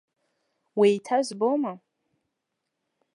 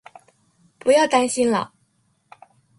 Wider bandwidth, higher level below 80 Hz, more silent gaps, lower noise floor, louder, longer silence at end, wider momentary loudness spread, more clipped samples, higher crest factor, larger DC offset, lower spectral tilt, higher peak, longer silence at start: about the same, 11 kHz vs 11.5 kHz; second, -86 dBFS vs -64 dBFS; neither; first, -82 dBFS vs -65 dBFS; second, -25 LUFS vs -19 LUFS; first, 1.4 s vs 1.15 s; about the same, 11 LU vs 10 LU; neither; about the same, 20 dB vs 18 dB; neither; first, -5.5 dB/octave vs -3.5 dB/octave; second, -8 dBFS vs -4 dBFS; about the same, 0.75 s vs 0.85 s